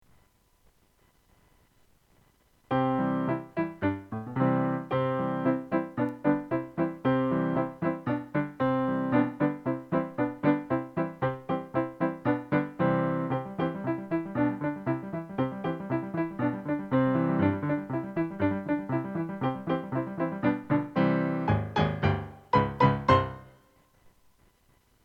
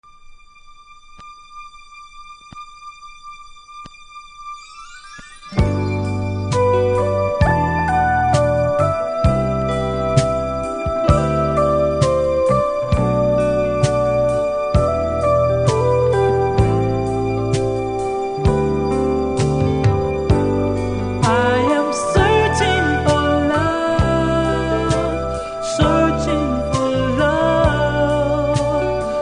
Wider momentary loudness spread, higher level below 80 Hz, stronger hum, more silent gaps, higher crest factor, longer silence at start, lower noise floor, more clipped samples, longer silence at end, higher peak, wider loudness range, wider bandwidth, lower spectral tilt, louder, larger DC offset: second, 7 LU vs 20 LU; second, -58 dBFS vs -30 dBFS; neither; neither; about the same, 20 dB vs 18 dB; first, 2.7 s vs 0.25 s; first, -65 dBFS vs -43 dBFS; neither; first, 1.55 s vs 0 s; second, -8 dBFS vs 0 dBFS; second, 4 LU vs 9 LU; second, 6.6 kHz vs 10.5 kHz; first, -9 dB/octave vs -6.5 dB/octave; second, -29 LUFS vs -17 LUFS; neither